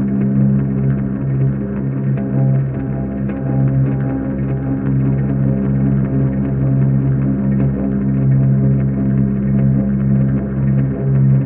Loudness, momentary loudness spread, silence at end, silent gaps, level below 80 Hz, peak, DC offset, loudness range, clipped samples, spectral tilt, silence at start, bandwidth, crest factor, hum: -16 LUFS; 5 LU; 0 s; none; -32 dBFS; -4 dBFS; under 0.1%; 2 LU; under 0.1%; -12.5 dB/octave; 0 s; 2.8 kHz; 10 dB; none